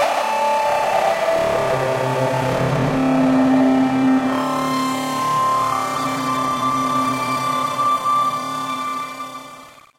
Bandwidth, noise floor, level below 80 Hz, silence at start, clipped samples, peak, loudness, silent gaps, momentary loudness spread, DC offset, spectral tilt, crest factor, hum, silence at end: 16 kHz; -41 dBFS; -50 dBFS; 0 s; under 0.1%; -6 dBFS; -19 LUFS; none; 8 LU; under 0.1%; -5.5 dB/octave; 14 dB; none; 0.3 s